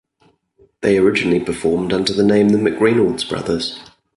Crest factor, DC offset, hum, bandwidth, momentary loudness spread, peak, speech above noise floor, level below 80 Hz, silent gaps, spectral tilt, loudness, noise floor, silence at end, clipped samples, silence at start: 14 dB; under 0.1%; none; 11.5 kHz; 8 LU; -2 dBFS; 43 dB; -48 dBFS; none; -5.5 dB/octave; -16 LUFS; -58 dBFS; 0.35 s; under 0.1%; 0.8 s